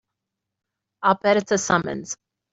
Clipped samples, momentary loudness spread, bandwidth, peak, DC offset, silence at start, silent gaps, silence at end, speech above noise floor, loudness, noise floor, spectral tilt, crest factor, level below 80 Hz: under 0.1%; 14 LU; 8 kHz; -4 dBFS; under 0.1%; 1 s; none; 0.4 s; 62 dB; -21 LUFS; -84 dBFS; -4 dB/octave; 22 dB; -60 dBFS